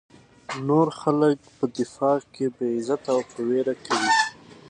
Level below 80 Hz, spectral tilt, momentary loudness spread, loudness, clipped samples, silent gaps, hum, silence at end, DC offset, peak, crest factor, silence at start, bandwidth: -68 dBFS; -5 dB/octave; 7 LU; -24 LUFS; under 0.1%; none; none; 0.35 s; under 0.1%; -6 dBFS; 18 dB; 0.5 s; 10.5 kHz